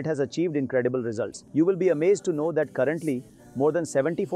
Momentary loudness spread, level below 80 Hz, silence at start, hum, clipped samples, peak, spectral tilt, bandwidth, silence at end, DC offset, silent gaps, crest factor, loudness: 8 LU; -68 dBFS; 0 s; none; under 0.1%; -12 dBFS; -6.5 dB/octave; 12.5 kHz; 0 s; under 0.1%; none; 14 dB; -25 LUFS